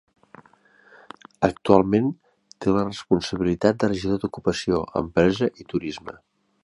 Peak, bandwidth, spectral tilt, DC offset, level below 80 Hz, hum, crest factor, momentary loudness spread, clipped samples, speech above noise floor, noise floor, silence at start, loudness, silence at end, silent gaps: -2 dBFS; 11.5 kHz; -6.5 dB/octave; under 0.1%; -48 dBFS; none; 22 dB; 11 LU; under 0.1%; 34 dB; -56 dBFS; 1.4 s; -23 LUFS; 0.55 s; none